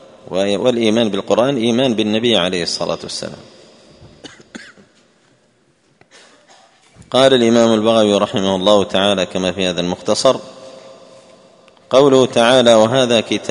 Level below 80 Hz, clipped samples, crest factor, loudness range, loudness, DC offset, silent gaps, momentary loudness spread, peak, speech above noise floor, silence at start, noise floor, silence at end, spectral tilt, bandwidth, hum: -56 dBFS; under 0.1%; 16 dB; 8 LU; -14 LUFS; under 0.1%; none; 11 LU; 0 dBFS; 43 dB; 0.3 s; -57 dBFS; 0 s; -4.5 dB/octave; 11 kHz; none